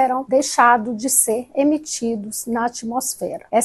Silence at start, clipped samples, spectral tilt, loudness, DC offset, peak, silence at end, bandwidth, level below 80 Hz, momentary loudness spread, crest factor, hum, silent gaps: 0 s; under 0.1%; -2.5 dB/octave; -19 LUFS; under 0.1%; 0 dBFS; 0 s; 13 kHz; -60 dBFS; 10 LU; 18 dB; none; none